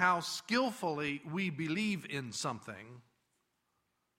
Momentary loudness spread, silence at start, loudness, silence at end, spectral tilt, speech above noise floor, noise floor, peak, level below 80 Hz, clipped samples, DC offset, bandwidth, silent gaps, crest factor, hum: 13 LU; 0 s; -36 LUFS; 1.2 s; -4 dB/octave; 45 dB; -81 dBFS; -14 dBFS; -76 dBFS; under 0.1%; under 0.1%; 16 kHz; none; 22 dB; none